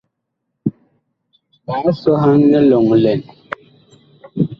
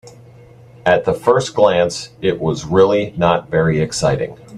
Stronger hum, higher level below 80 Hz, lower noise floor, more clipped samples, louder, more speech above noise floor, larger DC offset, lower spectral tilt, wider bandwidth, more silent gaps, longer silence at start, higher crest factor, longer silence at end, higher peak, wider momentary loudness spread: neither; second, -54 dBFS vs -44 dBFS; first, -75 dBFS vs -42 dBFS; neither; about the same, -14 LUFS vs -16 LUFS; first, 62 dB vs 27 dB; neither; first, -10 dB/octave vs -5.5 dB/octave; second, 5.8 kHz vs 12 kHz; neither; first, 0.65 s vs 0.05 s; about the same, 14 dB vs 16 dB; about the same, 0.05 s vs 0 s; about the same, -2 dBFS vs 0 dBFS; first, 20 LU vs 7 LU